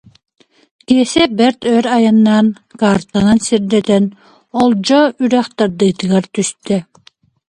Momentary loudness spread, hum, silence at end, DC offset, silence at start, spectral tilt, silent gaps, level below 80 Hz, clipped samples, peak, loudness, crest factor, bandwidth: 8 LU; none; 0.65 s; under 0.1%; 0.9 s; -5.5 dB/octave; none; -48 dBFS; under 0.1%; 0 dBFS; -13 LUFS; 14 dB; 11 kHz